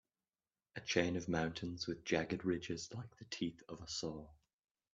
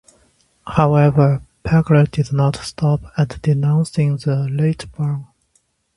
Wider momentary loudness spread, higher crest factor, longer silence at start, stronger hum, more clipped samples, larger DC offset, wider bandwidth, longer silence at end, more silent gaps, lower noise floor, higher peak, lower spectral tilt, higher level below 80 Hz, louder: first, 13 LU vs 10 LU; first, 24 dB vs 18 dB; about the same, 0.75 s vs 0.65 s; neither; neither; neither; second, 8.4 kHz vs 11.5 kHz; second, 0.6 s vs 0.75 s; neither; first, under -90 dBFS vs -63 dBFS; second, -18 dBFS vs 0 dBFS; second, -4.5 dB/octave vs -8 dB/octave; second, -68 dBFS vs -42 dBFS; second, -41 LUFS vs -17 LUFS